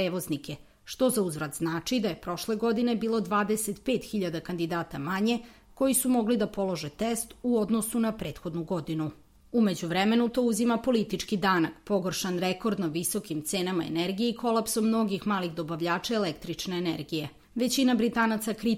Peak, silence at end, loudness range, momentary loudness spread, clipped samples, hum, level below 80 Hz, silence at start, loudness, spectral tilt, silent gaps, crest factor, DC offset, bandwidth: -12 dBFS; 0 s; 2 LU; 8 LU; under 0.1%; none; -58 dBFS; 0 s; -28 LUFS; -4.5 dB/octave; none; 16 dB; under 0.1%; 16.5 kHz